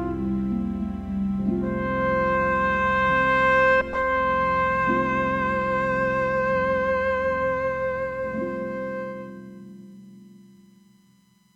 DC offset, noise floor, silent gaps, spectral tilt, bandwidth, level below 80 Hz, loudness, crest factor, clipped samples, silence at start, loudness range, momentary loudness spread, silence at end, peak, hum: under 0.1%; -59 dBFS; none; -7.5 dB/octave; 7.8 kHz; -44 dBFS; -23 LUFS; 14 dB; under 0.1%; 0 s; 10 LU; 11 LU; 1.15 s; -10 dBFS; none